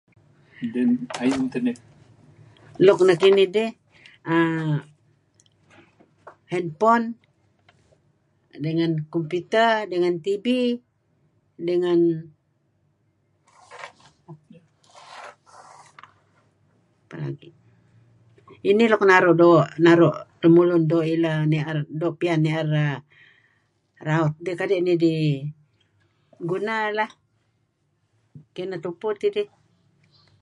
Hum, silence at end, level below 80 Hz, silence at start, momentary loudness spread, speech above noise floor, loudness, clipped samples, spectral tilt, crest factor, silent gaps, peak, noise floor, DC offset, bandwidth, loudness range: none; 0.95 s; -70 dBFS; 0.6 s; 19 LU; 49 dB; -21 LUFS; under 0.1%; -7 dB/octave; 22 dB; none; -2 dBFS; -70 dBFS; under 0.1%; 11 kHz; 13 LU